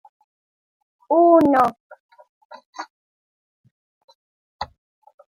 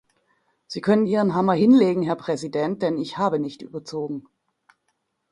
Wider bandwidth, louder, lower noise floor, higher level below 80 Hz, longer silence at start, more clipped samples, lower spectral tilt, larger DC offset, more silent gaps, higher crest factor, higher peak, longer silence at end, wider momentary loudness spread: about the same, 12 kHz vs 11 kHz; first, -16 LUFS vs -22 LUFS; first, under -90 dBFS vs -74 dBFS; about the same, -62 dBFS vs -64 dBFS; first, 1.1 s vs 0.7 s; neither; about the same, -6.5 dB/octave vs -7 dB/octave; neither; first, 1.80-1.90 s, 2.00-2.09 s, 2.29-2.50 s, 2.66-2.73 s, 2.90-3.64 s, 3.71-4.08 s, 4.15-4.59 s vs none; about the same, 20 dB vs 18 dB; first, -2 dBFS vs -6 dBFS; second, 0.7 s vs 1.1 s; first, 24 LU vs 16 LU